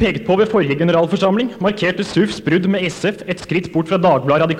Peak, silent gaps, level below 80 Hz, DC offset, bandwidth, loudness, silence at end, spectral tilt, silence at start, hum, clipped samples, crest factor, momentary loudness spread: -2 dBFS; none; -46 dBFS; under 0.1%; 11.5 kHz; -17 LUFS; 0 s; -6.5 dB/octave; 0 s; none; under 0.1%; 14 dB; 6 LU